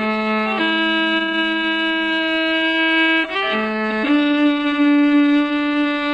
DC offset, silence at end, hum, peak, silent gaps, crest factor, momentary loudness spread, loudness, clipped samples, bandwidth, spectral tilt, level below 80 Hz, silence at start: under 0.1%; 0 s; none; -6 dBFS; none; 10 dB; 5 LU; -17 LUFS; under 0.1%; 8 kHz; -5 dB/octave; -54 dBFS; 0 s